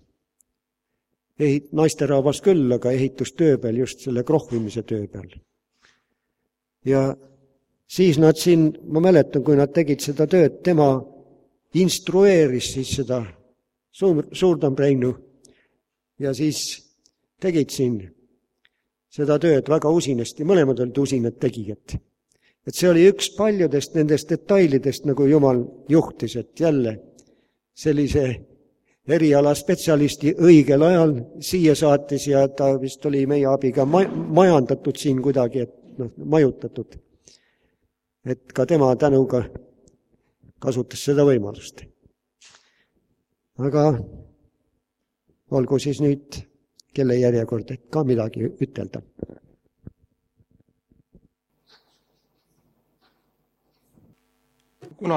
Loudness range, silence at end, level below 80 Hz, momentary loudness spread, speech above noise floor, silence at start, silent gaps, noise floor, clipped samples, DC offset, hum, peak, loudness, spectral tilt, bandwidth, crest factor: 9 LU; 0 s; -52 dBFS; 16 LU; 61 dB; 1.4 s; none; -80 dBFS; under 0.1%; under 0.1%; none; 0 dBFS; -20 LUFS; -6.5 dB/octave; 15.5 kHz; 20 dB